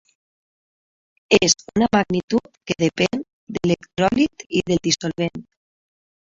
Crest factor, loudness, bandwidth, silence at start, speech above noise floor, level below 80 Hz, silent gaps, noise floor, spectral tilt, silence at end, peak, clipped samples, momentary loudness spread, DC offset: 22 dB; -20 LUFS; 7.8 kHz; 1.3 s; over 70 dB; -50 dBFS; 2.23-2.28 s, 2.57-2.61 s, 3.33-3.47 s, 4.46-4.50 s; under -90 dBFS; -4 dB/octave; 0.9 s; 0 dBFS; under 0.1%; 10 LU; under 0.1%